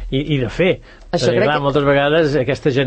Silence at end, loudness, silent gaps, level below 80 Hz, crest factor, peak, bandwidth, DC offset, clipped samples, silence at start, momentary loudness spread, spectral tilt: 0 s; -16 LUFS; none; -36 dBFS; 12 dB; -4 dBFS; 8.8 kHz; under 0.1%; under 0.1%; 0 s; 6 LU; -6.5 dB/octave